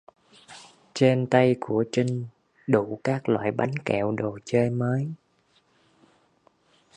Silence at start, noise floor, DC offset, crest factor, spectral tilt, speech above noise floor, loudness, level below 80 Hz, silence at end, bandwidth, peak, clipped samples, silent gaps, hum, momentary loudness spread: 0.5 s; -65 dBFS; under 0.1%; 22 dB; -7 dB/octave; 42 dB; -25 LUFS; -64 dBFS; 1.8 s; 9.8 kHz; -4 dBFS; under 0.1%; none; none; 19 LU